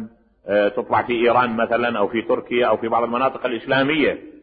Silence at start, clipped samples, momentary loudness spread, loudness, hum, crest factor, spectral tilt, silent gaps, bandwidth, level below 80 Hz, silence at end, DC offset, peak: 0 s; under 0.1%; 5 LU; -20 LUFS; none; 14 dB; -10 dB/octave; none; 4.9 kHz; -54 dBFS; 0.05 s; under 0.1%; -6 dBFS